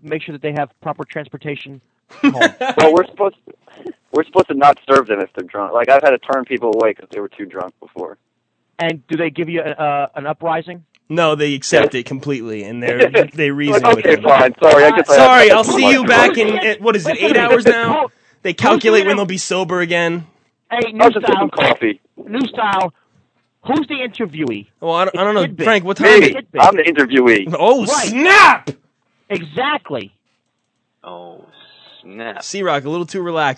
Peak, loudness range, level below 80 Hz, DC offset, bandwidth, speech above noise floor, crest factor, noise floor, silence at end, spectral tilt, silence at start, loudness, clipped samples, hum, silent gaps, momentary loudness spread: 0 dBFS; 12 LU; -62 dBFS; under 0.1%; 11 kHz; 55 dB; 14 dB; -69 dBFS; 0.05 s; -4 dB/octave; 0.05 s; -13 LUFS; 0.3%; none; none; 18 LU